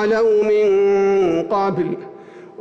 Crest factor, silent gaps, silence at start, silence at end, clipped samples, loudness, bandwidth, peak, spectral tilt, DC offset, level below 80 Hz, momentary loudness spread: 8 dB; none; 0 s; 0.15 s; under 0.1%; -17 LUFS; 7 kHz; -10 dBFS; -7 dB/octave; under 0.1%; -56 dBFS; 10 LU